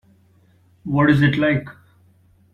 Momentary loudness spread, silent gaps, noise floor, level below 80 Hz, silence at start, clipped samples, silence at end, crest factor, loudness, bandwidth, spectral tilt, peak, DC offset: 20 LU; none; -56 dBFS; -50 dBFS; 0.85 s; under 0.1%; 0.85 s; 18 dB; -18 LUFS; 5.8 kHz; -8.5 dB/octave; -2 dBFS; under 0.1%